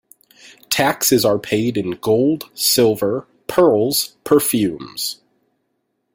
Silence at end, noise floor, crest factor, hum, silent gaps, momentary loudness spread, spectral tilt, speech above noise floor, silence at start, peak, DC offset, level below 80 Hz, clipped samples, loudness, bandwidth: 1 s; -71 dBFS; 18 dB; none; none; 10 LU; -3.5 dB/octave; 54 dB; 0.7 s; 0 dBFS; under 0.1%; -56 dBFS; under 0.1%; -17 LUFS; 17 kHz